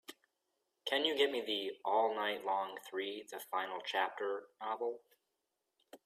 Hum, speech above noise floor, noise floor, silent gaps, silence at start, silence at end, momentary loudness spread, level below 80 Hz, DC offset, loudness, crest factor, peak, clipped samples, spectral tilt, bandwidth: none; 49 dB; -87 dBFS; none; 0.1 s; 0.1 s; 10 LU; -90 dBFS; under 0.1%; -37 LUFS; 20 dB; -18 dBFS; under 0.1%; -2 dB/octave; 15.5 kHz